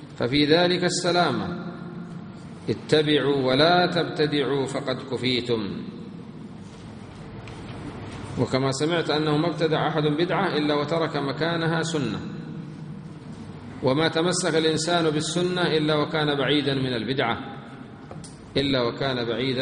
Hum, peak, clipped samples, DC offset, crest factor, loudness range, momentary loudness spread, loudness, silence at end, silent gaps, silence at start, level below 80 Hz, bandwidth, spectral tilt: none; -4 dBFS; under 0.1%; under 0.1%; 22 dB; 7 LU; 19 LU; -23 LUFS; 0 s; none; 0 s; -56 dBFS; 10 kHz; -5 dB/octave